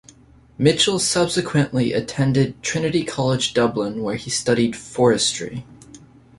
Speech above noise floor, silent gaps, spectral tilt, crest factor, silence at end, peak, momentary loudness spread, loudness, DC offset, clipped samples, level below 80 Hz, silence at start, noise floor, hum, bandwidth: 30 dB; none; -4.5 dB/octave; 18 dB; 0.4 s; -4 dBFS; 8 LU; -20 LUFS; under 0.1%; under 0.1%; -50 dBFS; 0.6 s; -50 dBFS; none; 11.5 kHz